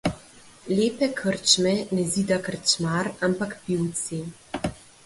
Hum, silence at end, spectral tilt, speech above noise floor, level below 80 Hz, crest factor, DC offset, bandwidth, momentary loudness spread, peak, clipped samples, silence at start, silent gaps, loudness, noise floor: none; 0.3 s; -3.5 dB/octave; 25 dB; -54 dBFS; 20 dB; under 0.1%; 11.5 kHz; 13 LU; -4 dBFS; under 0.1%; 0.05 s; none; -24 LUFS; -49 dBFS